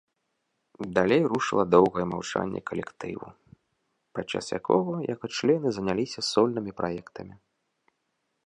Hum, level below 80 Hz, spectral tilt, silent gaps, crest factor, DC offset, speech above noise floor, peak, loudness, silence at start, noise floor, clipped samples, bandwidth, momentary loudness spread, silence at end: none; -60 dBFS; -5.5 dB/octave; none; 22 dB; under 0.1%; 52 dB; -6 dBFS; -26 LUFS; 0.8 s; -78 dBFS; under 0.1%; 11 kHz; 17 LU; 1.15 s